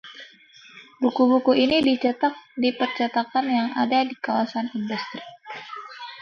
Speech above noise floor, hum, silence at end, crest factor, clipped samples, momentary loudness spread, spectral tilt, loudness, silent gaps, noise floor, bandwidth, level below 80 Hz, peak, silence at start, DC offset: 28 dB; none; 0 s; 18 dB; under 0.1%; 19 LU; -5.5 dB/octave; -22 LUFS; none; -50 dBFS; 6.6 kHz; -64 dBFS; -6 dBFS; 0.05 s; under 0.1%